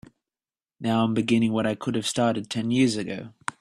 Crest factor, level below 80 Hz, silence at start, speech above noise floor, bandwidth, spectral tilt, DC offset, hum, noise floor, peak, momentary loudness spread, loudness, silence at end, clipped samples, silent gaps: 18 dB; -62 dBFS; 0.8 s; over 66 dB; 13 kHz; -5.5 dB/octave; under 0.1%; none; under -90 dBFS; -8 dBFS; 10 LU; -25 LUFS; 0.1 s; under 0.1%; none